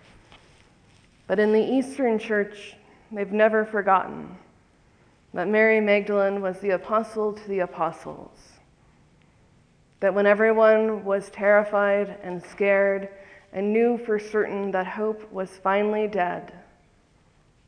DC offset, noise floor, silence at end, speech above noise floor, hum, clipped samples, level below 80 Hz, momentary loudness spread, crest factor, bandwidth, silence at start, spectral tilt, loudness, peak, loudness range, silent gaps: under 0.1%; -60 dBFS; 1.05 s; 37 dB; none; under 0.1%; -64 dBFS; 16 LU; 18 dB; 10 kHz; 1.3 s; -6.5 dB/octave; -23 LUFS; -6 dBFS; 6 LU; none